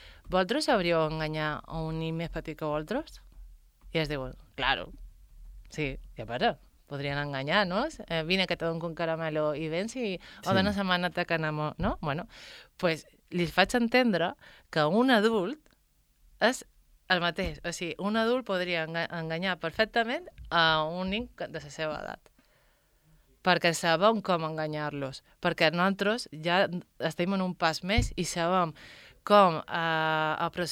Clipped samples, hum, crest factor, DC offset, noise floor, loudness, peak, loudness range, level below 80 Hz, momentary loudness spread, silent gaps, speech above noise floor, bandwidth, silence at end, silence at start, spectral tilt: under 0.1%; none; 24 dB; under 0.1%; -67 dBFS; -29 LUFS; -6 dBFS; 6 LU; -50 dBFS; 12 LU; none; 38 dB; 16.5 kHz; 0 s; 0 s; -5 dB/octave